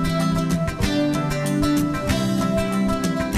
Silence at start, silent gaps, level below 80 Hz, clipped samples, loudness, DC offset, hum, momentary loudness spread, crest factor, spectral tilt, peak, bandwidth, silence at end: 0 s; none; -36 dBFS; under 0.1%; -22 LUFS; under 0.1%; none; 2 LU; 14 dB; -6 dB/octave; -6 dBFS; 15.5 kHz; 0 s